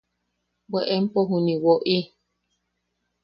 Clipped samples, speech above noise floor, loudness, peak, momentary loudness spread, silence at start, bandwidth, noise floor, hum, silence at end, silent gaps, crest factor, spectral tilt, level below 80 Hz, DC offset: under 0.1%; 55 dB; -23 LUFS; -6 dBFS; 9 LU; 0.7 s; 5.8 kHz; -76 dBFS; 60 Hz at -45 dBFS; 1.2 s; none; 18 dB; -9.5 dB/octave; -68 dBFS; under 0.1%